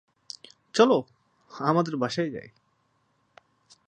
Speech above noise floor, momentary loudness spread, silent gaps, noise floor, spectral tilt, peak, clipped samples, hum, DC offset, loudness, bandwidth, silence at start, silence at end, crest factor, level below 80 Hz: 46 dB; 22 LU; none; -70 dBFS; -5.5 dB/octave; -6 dBFS; under 0.1%; none; under 0.1%; -25 LUFS; 10 kHz; 0.75 s; 1.4 s; 24 dB; -74 dBFS